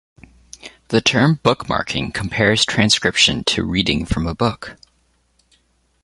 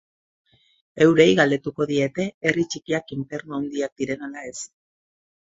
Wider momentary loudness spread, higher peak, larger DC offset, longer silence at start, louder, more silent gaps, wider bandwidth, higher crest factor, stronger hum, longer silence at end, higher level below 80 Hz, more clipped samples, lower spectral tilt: about the same, 16 LU vs 18 LU; about the same, 0 dBFS vs -2 dBFS; neither; second, 0.65 s vs 0.95 s; first, -17 LUFS vs -22 LUFS; second, none vs 2.34-2.41 s, 3.92-3.96 s; first, 11.5 kHz vs 8 kHz; about the same, 18 dB vs 22 dB; neither; first, 1.3 s vs 0.8 s; first, -38 dBFS vs -62 dBFS; neither; about the same, -4 dB/octave vs -5 dB/octave